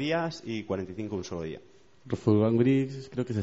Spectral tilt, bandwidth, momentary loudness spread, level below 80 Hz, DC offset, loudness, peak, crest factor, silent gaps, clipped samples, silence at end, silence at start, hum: -7 dB/octave; 8 kHz; 14 LU; -62 dBFS; 0.1%; -29 LUFS; -10 dBFS; 18 dB; none; under 0.1%; 0 s; 0 s; none